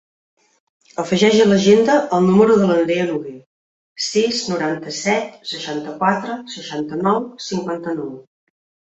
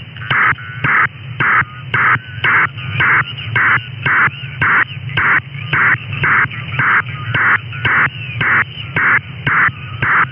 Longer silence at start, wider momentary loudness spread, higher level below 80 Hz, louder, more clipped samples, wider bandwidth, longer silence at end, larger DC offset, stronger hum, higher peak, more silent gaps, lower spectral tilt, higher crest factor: first, 1 s vs 0 s; first, 15 LU vs 5 LU; second, -60 dBFS vs -46 dBFS; second, -18 LUFS vs -14 LUFS; neither; first, 8.2 kHz vs 5.4 kHz; first, 0.8 s vs 0 s; neither; neither; about the same, -2 dBFS vs -4 dBFS; first, 3.46-3.96 s vs none; second, -5 dB/octave vs -7.5 dB/octave; first, 18 dB vs 12 dB